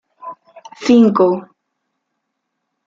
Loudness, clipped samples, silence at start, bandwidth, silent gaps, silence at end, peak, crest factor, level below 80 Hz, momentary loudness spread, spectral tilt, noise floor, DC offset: -14 LUFS; under 0.1%; 0.25 s; 7.4 kHz; none; 1.4 s; -2 dBFS; 16 dB; -62 dBFS; 24 LU; -6.5 dB/octave; -74 dBFS; under 0.1%